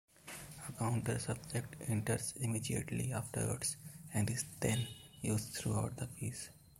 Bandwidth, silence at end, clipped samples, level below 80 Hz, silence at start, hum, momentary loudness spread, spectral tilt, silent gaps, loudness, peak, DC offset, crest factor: 16.5 kHz; 0.05 s; under 0.1%; -62 dBFS; 0.25 s; none; 10 LU; -5 dB/octave; none; -39 LUFS; -20 dBFS; under 0.1%; 20 dB